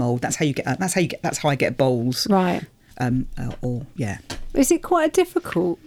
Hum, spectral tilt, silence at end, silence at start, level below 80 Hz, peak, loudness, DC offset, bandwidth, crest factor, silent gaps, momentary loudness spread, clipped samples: none; -5 dB/octave; 0.1 s; 0 s; -40 dBFS; -6 dBFS; -22 LUFS; under 0.1%; 18 kHz; 14 dB; none; 10 LU; under 0.1%